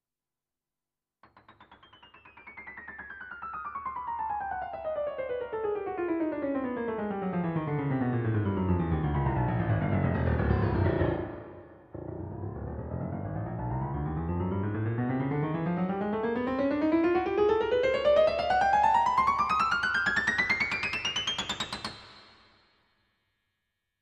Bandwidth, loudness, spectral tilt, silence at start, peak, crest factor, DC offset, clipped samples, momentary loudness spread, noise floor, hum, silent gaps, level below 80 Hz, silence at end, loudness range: 10.5 kHz; -29 LUFS; -6.5 dB/octave; 1.5 s; -12 dBFS; 18 dB; under 0.1%; under 0.1%; 14 LU; under -90 dBFS; none; none; -46 dBFS; 1.75 s; 11 LU